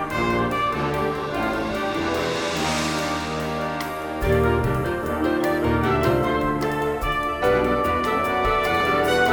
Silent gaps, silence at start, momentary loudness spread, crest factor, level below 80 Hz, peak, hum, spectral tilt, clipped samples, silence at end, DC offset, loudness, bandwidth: none; 0 s; 5 LU; 14 dB; -36 dBFS; -8 dBFS; none; -5.5 dB/octave; under 0.1%; 0 s; under 0.1%; -22 LUFS; over 20 kHz